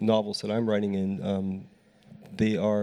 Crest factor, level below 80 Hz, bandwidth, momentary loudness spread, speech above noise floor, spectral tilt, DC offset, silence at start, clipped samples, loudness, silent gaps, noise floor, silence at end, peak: 18 dB; -60 dBFS; 11.5 kHz; 9 LU; 26 dB; -7 dB/octave; under 0.1%; 0 s; under 0.1%; -28 LUFS; none; -53 dBFS; 0 s; -10 dBFS